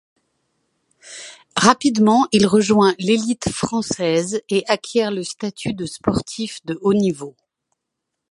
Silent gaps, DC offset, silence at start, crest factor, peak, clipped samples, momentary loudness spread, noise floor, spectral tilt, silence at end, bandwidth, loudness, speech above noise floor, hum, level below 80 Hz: none; under 0.1%; 1.05 s; 20 dB; 0 dBFS; under 0.1%; 13 LU; -79 dBFS; -4.5 dB/octave; 1 s; 11.5 kHz; -19 LUFS; 61 dB; none; -52 dBFS